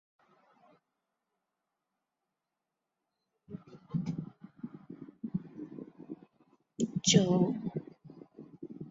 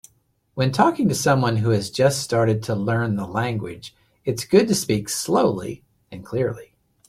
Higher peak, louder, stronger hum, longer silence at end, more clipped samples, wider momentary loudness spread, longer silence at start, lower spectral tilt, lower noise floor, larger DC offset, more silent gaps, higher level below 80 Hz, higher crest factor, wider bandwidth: second, -12 dBFS vs -2 dBFS; second, -32 LUFS vs -21 LUFS; neither; second, 0 s vs 0.45 s; neither; first, 27 LU vs 17 LU; first, 3.5 s vs 0.55 s; about the same, -5.5 dB/octave vs -5.5 dB/octave; first, -88 dBFS vs -64 dBFS; neither; neither; second, -72 dBFS vs -54 dBFS; first, 26 dB vs 20 dB; second, 7.4 kHz vs 16 kHz